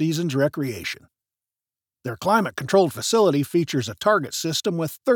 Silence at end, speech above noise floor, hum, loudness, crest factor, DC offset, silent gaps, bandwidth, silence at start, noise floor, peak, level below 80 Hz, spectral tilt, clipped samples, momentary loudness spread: 0 s; over 68 dB; none; -22 LUFS; 18 dB; under 0.1%; none; over 20 kHz; 0 s; under -90 dBFS; -4 dBFS; -66 dBFS; -5 dB/octave; under 0.1%; 11 LU